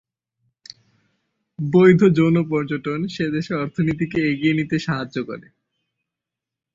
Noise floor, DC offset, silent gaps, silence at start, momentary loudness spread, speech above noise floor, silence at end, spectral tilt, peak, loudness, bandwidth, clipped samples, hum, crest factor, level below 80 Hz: -86 dBFS; under 0.1%; none; 1.6 s; 14 LU; 67 dB; 1.35 s; -8 dB/octave; -2 dBFS; -19 LUFS; 7.6 kHz; under 0.1%; none; 18 dB; -56 dBFS